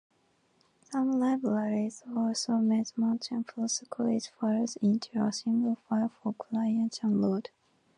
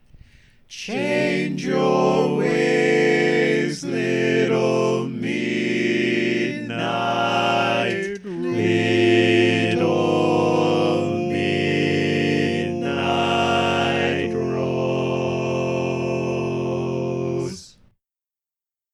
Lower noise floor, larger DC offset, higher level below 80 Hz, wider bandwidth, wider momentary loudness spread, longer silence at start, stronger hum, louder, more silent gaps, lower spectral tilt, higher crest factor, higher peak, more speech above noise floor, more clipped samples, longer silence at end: second, -70 dBFS vs under -90 dBFS; neither; second, -78 dBFS vs -58 dBFS; about the same, 11 kHz vs 11.5 kHz; about the same, 6 LU vs 7 LU; first, 0.9 s vs 0.15 s; neither; second, -30 LUFS vs -20 LUFS; neither; about the same, -5.5 dB/octave vs -6 dB/octave; about the same, 14 dB vs 16 dB; second, -16 dBFS vs -6 dBFS; second, 41 dB vs over 70 dB; neither; second, 0.5 s vs 1.25 s